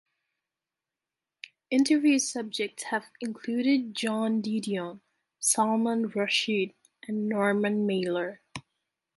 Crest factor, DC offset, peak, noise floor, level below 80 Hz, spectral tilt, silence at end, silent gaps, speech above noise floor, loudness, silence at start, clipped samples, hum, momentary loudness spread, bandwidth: 18 dB; under 0.1%; -10 dBFS; -89 dBFS; -76 dBFS; -3.5 dB/octave; 0.55 s; none; 62 dB; -28 LUFS; 1.7 s; under 0.1%; none; 16 LU; 12 kHz